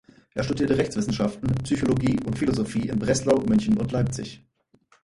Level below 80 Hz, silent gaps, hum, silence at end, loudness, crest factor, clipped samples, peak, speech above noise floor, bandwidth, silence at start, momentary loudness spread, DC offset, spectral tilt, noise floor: -46 dBFS; none; none; 0.65 s; -24 LUFS; 18 dB; under 0.1%; -6 dBFS; 38 dB; 11.5 kHz; 0.35 s; 7 LU; under 0.1%; -6.5 dB/octave; -62 dBFS